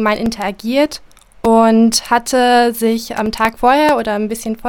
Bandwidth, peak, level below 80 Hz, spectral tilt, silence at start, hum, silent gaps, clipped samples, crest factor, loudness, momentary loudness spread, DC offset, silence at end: 17.5 kHz; 0 dBFS; -42 dBFS; -4 dB/octave; 0 s; none; none; under 0.1%; 14 dB; -14 LUFS; 9 LU; under 0.1%; 0 s